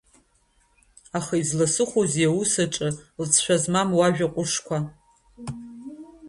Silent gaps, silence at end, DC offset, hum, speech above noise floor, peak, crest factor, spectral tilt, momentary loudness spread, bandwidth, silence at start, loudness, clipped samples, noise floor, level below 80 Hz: none; 0 s; under 0.1%; none; 41 dB; -4 dBFS; 22 dB; -4 dB/octave; 18 LU; 11.5 kHz; 1.15 s; -23 LUFS; under 0.1%; -64 dBFS; -58 dBFS